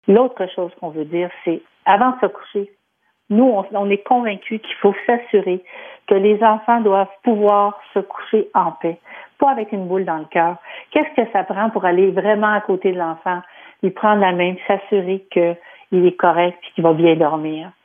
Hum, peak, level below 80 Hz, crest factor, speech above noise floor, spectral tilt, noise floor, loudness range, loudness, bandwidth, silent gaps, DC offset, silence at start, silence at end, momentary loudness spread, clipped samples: none; -2 dBFS; -70 dBFS; 16 dB; 49 dB; -9.5 dB/octave; -67 dBFS; 3 LU; -18 LUFS; 3.7 kHz; none; under 0.1%; 0.05 s; 0.15 s; 11 LU; under 0.1%